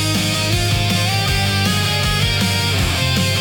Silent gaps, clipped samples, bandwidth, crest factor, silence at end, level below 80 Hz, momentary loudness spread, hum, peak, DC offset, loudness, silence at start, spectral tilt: none; under 0.1%; 18 kHz; 12 dB; 0 s; -32 dBFS; 1 LU; none; -4 dBFS; under 0.1%; -16 LUFS; 0 s; -3.5 dB/octave